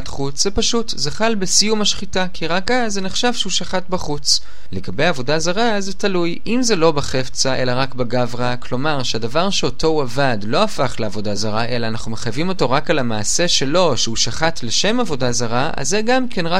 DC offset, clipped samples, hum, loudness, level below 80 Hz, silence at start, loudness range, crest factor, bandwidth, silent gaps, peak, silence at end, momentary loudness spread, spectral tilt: 10%; under 0.1%; none; -18 LUFS; -38 dBFS; 0 s; 2 LU; 18 dB; 16 kHz; none; 0 dBFS; 0 s; 7 LU; -3.5 dB/octave